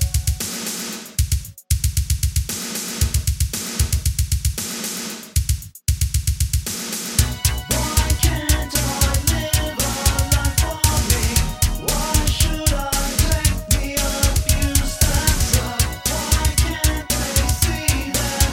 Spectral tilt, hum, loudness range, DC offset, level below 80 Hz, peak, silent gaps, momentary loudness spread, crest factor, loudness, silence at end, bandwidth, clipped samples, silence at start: -3.5 dB/octave; none; 4 LU; under 0.1%; -24 dBFS; 0 dBFS; none; 6 LU; 20 dB; -20 LUFS; 0 s; 17 kHz; under 0.1%; 0 s